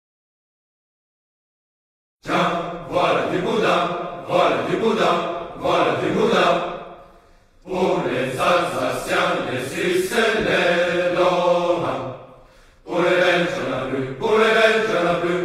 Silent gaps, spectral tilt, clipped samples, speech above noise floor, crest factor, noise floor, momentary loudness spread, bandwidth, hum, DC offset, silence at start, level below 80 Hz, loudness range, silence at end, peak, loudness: none; -5 dB/octave; under 0.1%; 32 dB; 18 dB; -51 dBFS; 9 LU; 15.5 kHz; none; under 0.1%; 2.25 s; -52 dBFS; 3 LU; 0 s; -2 dBFS; -20 LUFS